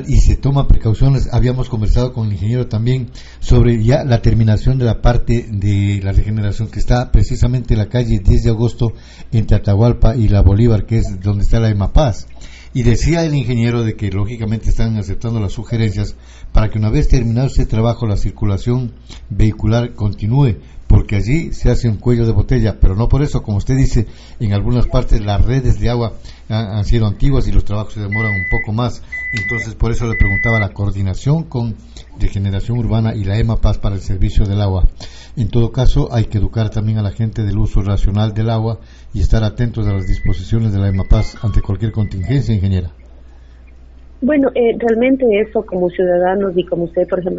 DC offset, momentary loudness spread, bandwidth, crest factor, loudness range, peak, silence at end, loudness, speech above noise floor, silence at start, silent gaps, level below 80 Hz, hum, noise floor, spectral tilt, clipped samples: under 0.1%; 7 LU; 8 kHz; 12 dB; 3 LU; 0 dBFS; 0 s; -16 LUFS; 25 dB; 0 s; none; -18 dBFS; none; -38 dBFS; -7.5 dB/octave; under 0.1%